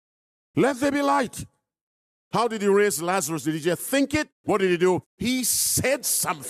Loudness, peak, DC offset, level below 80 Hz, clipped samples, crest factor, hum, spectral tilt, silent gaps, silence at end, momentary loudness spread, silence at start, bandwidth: -23 LUFS; -10 dBFS; under 0.1%; -58 dBFS; under 0.1%; 14 dB; none; -3.5 dB/octave; 1.81-2.31 s, 4.32-4.44 s, 5.06-5.18 s; 0 s; 6 LU; 0.55 s; 15.5 kHz